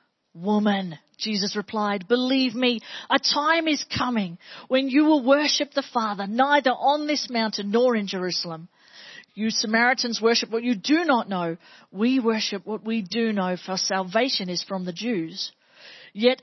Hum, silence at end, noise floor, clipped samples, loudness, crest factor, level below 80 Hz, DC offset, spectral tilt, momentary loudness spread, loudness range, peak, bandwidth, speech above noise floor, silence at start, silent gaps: none; 0.1 s; -48 dBFS; under 0.1%; -23 LUFS; 20 dB; -68 dBFS; under 0.1%; -4 dB/octave; 11 LU; 3 LU; -4 dBFS; 6.2 kHz; 24 dB; 0.35 s; none